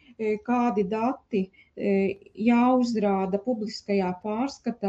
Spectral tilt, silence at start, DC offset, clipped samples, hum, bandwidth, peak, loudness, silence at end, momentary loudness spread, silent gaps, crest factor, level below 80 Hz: -7 dB/octave; 0.2 s; under 0.1%; under 0.1%; none; 8 kHz; -10 dBFS; -26 LUFS; 0 s; 8 LU; none; 14 dB; -64 dBFS